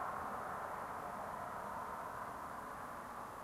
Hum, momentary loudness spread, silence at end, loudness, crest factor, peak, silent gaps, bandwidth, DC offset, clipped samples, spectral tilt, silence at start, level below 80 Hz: none; 4 LU; 0 s; -45 LUFS; 14 dB; -30 dBFS; none; 16 kHz; under 0.1%; under 0.1%; -4.5 dB/octave; 0 s; -68 dBFS